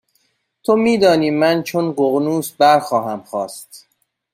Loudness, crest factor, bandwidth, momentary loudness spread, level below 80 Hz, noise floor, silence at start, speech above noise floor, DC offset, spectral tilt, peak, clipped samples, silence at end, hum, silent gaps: -16 LUFS; 16 dB; 16 kHz; 12 LU; -62 dBFS; -65 dBFS; 0.7 s; 49 dB; under 0.1%; -5.5 dB/octave; -2 dBFS; under 0.1%; 0.55 s; none; none